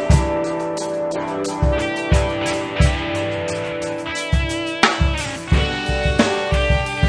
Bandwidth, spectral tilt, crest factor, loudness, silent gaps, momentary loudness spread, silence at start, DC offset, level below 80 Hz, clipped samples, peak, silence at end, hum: 10.5 kHz; -5 dB/octave; 18 dB; -20 LUFS; none; 7 LU; 0 s; under 0.1%; -24 dBFS; under 0.1%; 0 dBFS; 0 s; none